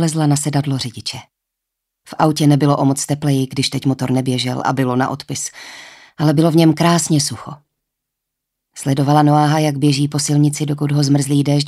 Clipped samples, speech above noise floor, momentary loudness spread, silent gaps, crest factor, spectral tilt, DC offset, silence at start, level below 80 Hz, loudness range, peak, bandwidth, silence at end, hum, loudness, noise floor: under 0.1%; 64 dB; 13 LU; none; 16 dB; -5.5 dB/octave; under 0.1%; 0 s; -58 dBFS; 2 LU; -2 dBFS; 14 kHz; 0 s; none; -16 LUFS; -79 dBFS